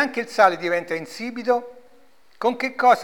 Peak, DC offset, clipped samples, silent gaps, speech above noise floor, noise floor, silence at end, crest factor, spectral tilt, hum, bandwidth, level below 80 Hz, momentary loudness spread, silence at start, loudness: -4 dBFS; 0.3%; under 0.1%; none; 36 dB; -57 dBFS; 0 s; 18 dB; -4 dB/octave; none; 18.5 kHz; -72 dBFS; 11 LU; 0 s; -22 LUFS